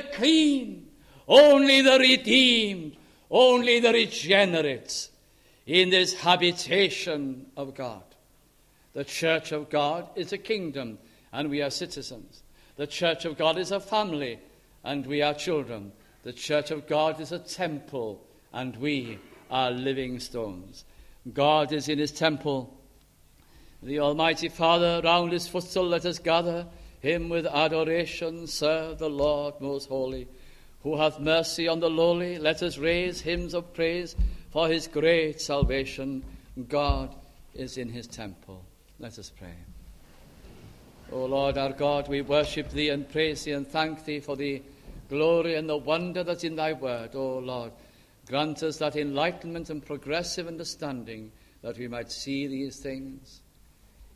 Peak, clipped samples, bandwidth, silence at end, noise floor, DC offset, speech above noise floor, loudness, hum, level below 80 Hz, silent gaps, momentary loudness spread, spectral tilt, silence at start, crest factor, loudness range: -4 dBFS; under 0.1%; 15 kHz; 0.1 s; -61 dBFS; under 0.1%; 34 dB; -26 LUFS; none; -46 dBFS; none; 18 LU; -4 dB/octave; 0 s; 24 dB; 11 LU